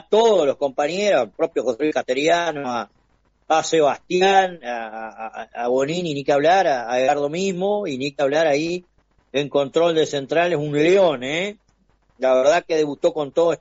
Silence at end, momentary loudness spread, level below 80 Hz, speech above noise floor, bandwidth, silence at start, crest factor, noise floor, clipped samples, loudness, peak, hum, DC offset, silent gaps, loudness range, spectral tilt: 0.05 s; 11 LU; -62 dBFS; 43 dB; 8 kHz; 0.1 s; 16 dB; -62 dBFS; under 0.1%; -20 LUFS; -4 dBFS; none; under 0.1%; none; 2 LU; -3 dB/octave